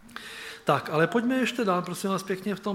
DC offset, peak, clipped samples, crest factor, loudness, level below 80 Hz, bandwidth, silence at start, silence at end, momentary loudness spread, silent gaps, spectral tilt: under 0.1%; -6 dBFS; under 0.1%; 20 dB; -27 LUFS; -66 dBFS; 16.5 kHz; 0.05 s; 0 s; 12 LU; none; -5.5 dB/octave